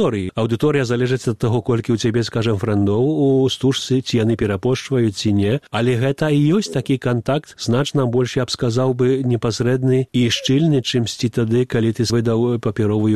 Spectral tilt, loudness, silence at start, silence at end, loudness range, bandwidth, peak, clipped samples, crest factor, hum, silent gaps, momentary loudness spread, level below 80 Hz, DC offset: -6 dB/octave; -18 LUFS; 0 s; 0 s; 1 LU; 13 kHz; -4 dBFS; under 0.1%; 14 dB; none; none; 4 LU; -48 dBFS; 0.3%